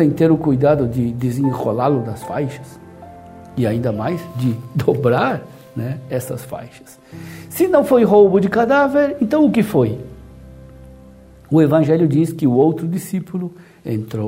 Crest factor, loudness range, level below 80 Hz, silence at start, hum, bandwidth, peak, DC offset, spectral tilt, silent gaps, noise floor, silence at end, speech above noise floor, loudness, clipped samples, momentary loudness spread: 16 dB; 7 LU; -48 dBFS; 0 s; none; 16 kHz; 0 dBFS; under 0.1%; -8 dB/octave; none; -42 dBFS; 0 s; 26 dB; -17 LUFS; under 0.1%; 17 LU